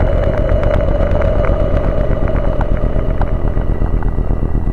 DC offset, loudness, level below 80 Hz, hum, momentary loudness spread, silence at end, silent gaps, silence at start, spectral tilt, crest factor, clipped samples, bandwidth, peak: under 0.1%; -17 LUFS; -16 dBFS; none; 4 LU; 0 s; none; 0 s; -9.5 dB/octave; 12 dB; under 0.1%; 4.4 kHz; 0 dBFS